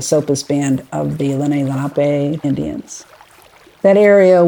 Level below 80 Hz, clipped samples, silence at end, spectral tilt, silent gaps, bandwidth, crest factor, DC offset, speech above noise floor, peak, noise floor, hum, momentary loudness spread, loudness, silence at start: -50 dBFS; under 0.1%; 0 s; -6 dB/octave; none; 19 kHz; 14 dB; under 0.1%; 31 dB; 0 dBFS; -45 dBFS; none; 14 LU; -15 LUFS; 0 s